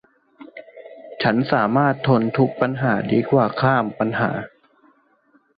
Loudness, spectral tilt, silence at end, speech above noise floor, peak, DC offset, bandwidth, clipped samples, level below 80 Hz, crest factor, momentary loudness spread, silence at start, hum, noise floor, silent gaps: -20 LUFS; -10.5 dB/octave; 1.1 s; 41 dB; -4 dBFS; under 0.1%; 5 kHz; under 0.1%; -56 dBFS; 18 dB; 22 LU; 0.4 s; none; -60 dBFS; none